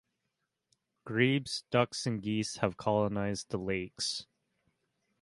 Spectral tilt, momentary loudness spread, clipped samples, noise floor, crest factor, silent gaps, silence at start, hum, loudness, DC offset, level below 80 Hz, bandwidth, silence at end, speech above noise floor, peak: -5 dB/octave; 7 LU; under 0.1%; -84 dBFS; 22 dB; none; 1.05 s; none; -33 LUFS; under 0.1%; -62 dBFS; 11.5 kHz; 1 s; 52 dB; -12 dBFS